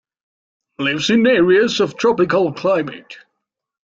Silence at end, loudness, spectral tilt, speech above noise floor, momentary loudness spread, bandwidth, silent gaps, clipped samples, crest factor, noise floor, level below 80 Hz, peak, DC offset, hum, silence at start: 0.8 s; -16 LUFS; -5 dB/octave; 63 dB; 9 LU; 7.8 kHz; none; under 0.1%; 14 dB; -79 dBFS; -58 dBFS; -4 dBFS; under 0.1%; none; 0.8 s